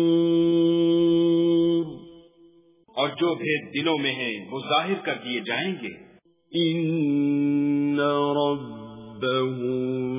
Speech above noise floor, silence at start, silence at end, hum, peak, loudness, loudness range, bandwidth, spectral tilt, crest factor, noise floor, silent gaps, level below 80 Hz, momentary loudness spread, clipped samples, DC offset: 32 dB; 0 s; 0 s; none; -10 dBFS; -24 LUFS; 4 LU; 3.8 kHz; -10.5 dB/octave; 14 dB; -56 dBFS; none; -66 dBFS; 12 LU; under 0.1%; under 0.1%